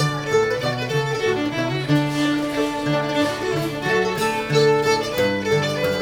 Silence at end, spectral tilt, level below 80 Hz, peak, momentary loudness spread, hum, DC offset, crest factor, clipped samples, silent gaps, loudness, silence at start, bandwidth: 0 s; -5 dB/octave; -50 dBFS; -6 dBFS; 5 LU; none; under 0.1%; 14 dB; under 0.1%; none; -21 LUFS; 0 s; over 20 kHz